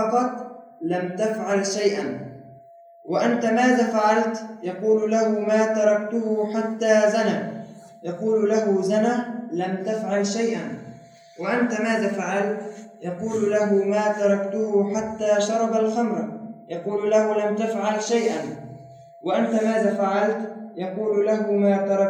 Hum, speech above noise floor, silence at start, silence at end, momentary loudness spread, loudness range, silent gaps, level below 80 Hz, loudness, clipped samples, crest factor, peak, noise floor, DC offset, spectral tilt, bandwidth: none; 26 dB; 0 s; 0 s; 14 LU; 4 LU; none; -74 dBFS; -23 LUFS; under 0.1%; 16 dB; -6 dBFS; -48 dBFS; under 0.1%; -5.5 dB/octave; 10.5 kHz